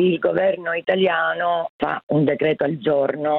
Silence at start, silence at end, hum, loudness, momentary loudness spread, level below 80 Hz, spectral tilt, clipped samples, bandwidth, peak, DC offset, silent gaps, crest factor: 0 s; 0 s; none; -20 LUFS; 5 LU; -62 dBFS; -9.5 dB/octave; under 0.1%; 4.3 kHz; -4 dBFS; under 0.1%; 1.69-1.79 s, 2.03-2.07 s; 14 dB